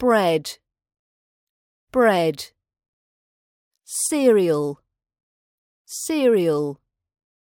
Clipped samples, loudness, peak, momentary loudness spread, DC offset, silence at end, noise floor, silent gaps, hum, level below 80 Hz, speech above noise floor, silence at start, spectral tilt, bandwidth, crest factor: under 0.1%; -20 LUFS; -6 dBFS; 17 LU; under 0.1%; 0.75 s; under -90 dBFS; 0.99-1.87 s, 2.88-3.71 s, 5.23-5.85 s; none; -64 dBFS; over 71 dB; 0 s; -4.5 dB/octave; 17.5 kHz; 18 dB